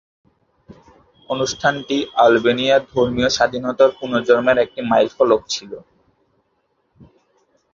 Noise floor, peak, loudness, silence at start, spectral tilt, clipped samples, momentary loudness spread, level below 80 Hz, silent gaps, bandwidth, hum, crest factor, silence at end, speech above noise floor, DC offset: -67 dBFS; -2 dBFS; -17 LUFS; 0.7 s; -4 dB/octave; under 0.1%; 9 LU; -52 dBFS; none; 7.6 kHz; none; 18 dB; 1.95 s; 50 dB; under 0.1%